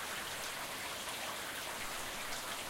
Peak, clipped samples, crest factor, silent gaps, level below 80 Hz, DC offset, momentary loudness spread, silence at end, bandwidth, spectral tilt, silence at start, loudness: -28 dBFS; under 0.1%; 14 dB; none; -62 dBFS; under 0.1%; 1 LU; 0 s; 17 kHz; -1 dB/octave; 0 s; -40 LUFS